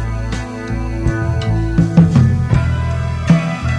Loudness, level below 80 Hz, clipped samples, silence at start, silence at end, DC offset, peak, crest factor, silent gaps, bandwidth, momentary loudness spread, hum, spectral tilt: -16 LUFS; -24 dBFS; under 0.1%; 0 s; 0 s; under 0.1%; 0 dBFS; 14 dB; none; 10.5 kHz; 11 LU; none; -8 dB/octave